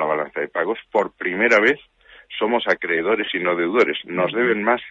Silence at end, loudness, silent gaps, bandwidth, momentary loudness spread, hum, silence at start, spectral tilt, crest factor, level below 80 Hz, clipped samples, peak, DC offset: 0 s; -20 LUFS; none; 7.8 kHz; 8 LU; none; 0 s; -5 dB/octave; 16 dB; -64 dBFS; under 0.1%; -4 dBFS; under 0.1%